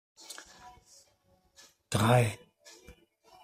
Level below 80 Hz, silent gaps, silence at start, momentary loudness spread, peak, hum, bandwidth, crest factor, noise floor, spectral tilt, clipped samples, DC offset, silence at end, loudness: -60 dBFS; none; 0.3 s; 28 LU; -12 dBFS; none; 15.5 kHz; 22 dB; -69 dBFS; -5.5 dB/octave; under 0.1%; under 0.1%; 0.55 s; -28 LUFS